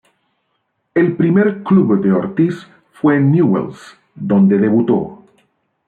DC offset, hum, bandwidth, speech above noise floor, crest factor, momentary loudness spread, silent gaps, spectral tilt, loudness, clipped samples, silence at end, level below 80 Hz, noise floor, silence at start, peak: under 0.1%; none; 4.7 kHz; 55 dB; 14 dB; 8 LU; none; -10 dB/octave; -14 LUFS; under 0.1%; 0.75 s; -58 dBFS; -68 dBFS; 0.95 s; -2 dBFS